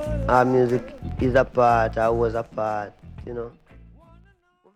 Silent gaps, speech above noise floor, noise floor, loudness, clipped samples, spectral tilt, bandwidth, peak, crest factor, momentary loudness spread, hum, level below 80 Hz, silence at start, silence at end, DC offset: none; 37 dB; -59 dBFS; -21 LUFS; under 0.1%; -7.5 dB/octave; 13 kHz; -4 dBFS; 20 dB; 16 LU; none; -38 dBFS; 0 s; 1.25 s; under 0.1%